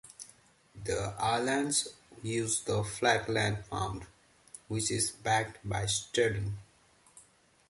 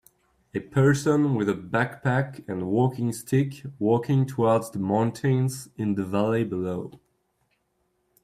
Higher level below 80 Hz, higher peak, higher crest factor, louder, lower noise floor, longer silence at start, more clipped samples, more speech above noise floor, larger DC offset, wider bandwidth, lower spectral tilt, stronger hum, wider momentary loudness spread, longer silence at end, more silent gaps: first, -56 dBFS vs -62 dBFS; second, -12 dBFS vs -8 dBFS; first, 22 dB vs 16 dB; second, -32 LUFS vs -25 LUFS; second, -64 dBFS vs -72 dBFS; second, 0.05 s vs 0.55 s; neither; second, 32 dB vs 48 dB; neither; second, 11.5 kHz vs 14.5 kHz; second, -3.5 dB/octave vs -7 dB/octave; neither; first, 16 LU vs 9 LU; second, 0.5 s vs 1.25 s; neither